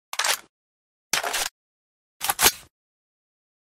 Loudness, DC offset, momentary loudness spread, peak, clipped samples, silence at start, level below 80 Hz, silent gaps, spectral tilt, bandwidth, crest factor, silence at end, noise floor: -23 LUFS; under 0.1%; 10 LU; -2 dBFS; under 0.1%; 0.15 s; -54 dBFS; 0.49-1.10 s, 1.51-2.20 s; 1 dB/octave; 16 kHz; 28 dB; 1.05 s; under -90 dBFS